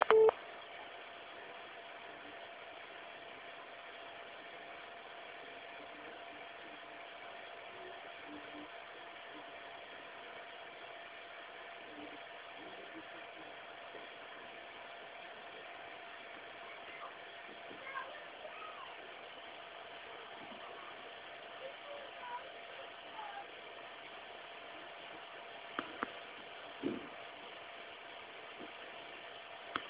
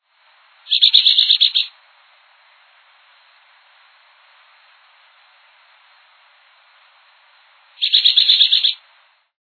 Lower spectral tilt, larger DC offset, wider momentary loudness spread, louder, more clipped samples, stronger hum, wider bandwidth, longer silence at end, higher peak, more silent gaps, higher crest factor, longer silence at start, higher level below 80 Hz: first, -0.5 dB/octave vs 6 dB/octave; neither; second, 5 LU vs 11 LU; second, -46 LUFS vs -12 LUFS; neither; neither; second, 4 kHz vs 4.7 kHz; second, 0 s vs 0.65 s; second, -10 dBFS vs 0 dBFS; neither; first, 34 dB vs 20 dB; second, 0 s vs 0.7 s; first, -82 dBFS vs under -90 dBFS